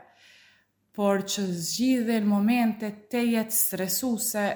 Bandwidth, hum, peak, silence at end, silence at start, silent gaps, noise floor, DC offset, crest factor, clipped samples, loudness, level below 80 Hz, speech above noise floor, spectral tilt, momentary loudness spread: over 20 kHz; none; -10 dBFS; 0 s; 0.95 s; none; -63 dBFS; under 0.1%; 16 dB; under 0.1%; -25 LUFS; -70 dBFS; 38 dB; -4 dB/octave; 6 LU